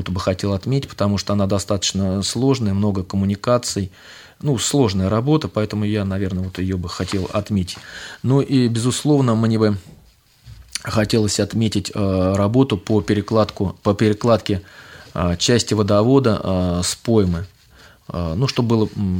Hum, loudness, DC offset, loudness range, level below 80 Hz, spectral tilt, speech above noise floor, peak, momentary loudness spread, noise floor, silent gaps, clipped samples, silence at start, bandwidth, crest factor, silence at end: none; -19 LUFS; under 0.1%; 2 LU; -44 dBFS; -5.5 dB/octave; 33 dB; -2 dBFS; 8 LU; -51 dBFS; none; under 0.1%; 0 s; 17.5 kHz; 16 dB; 0 s